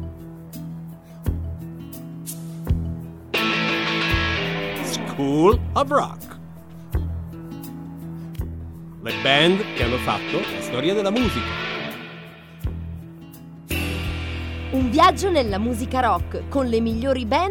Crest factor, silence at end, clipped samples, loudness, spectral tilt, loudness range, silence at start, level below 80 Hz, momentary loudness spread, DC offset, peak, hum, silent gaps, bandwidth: 20 dB; 0 s; under 0.1%; -22 LUFS; -5.5 dB/octave; 8 LU; 0 s; -36 dBFS; 19 LU; under 0.1%; -2 dBFS; none; none; 19.5 kHz